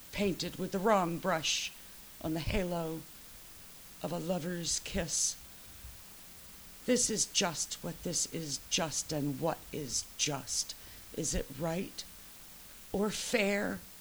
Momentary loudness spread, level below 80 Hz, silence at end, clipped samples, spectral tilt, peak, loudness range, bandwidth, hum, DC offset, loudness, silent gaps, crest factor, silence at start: 19 LU; -52 dBFS; 0 s; under 0.1%; -3 dB/octave; -14 dBFS; 4 LU; over 20 kHz; none; under 0.1%; -34 LUFS; none; 22 dB; 0 s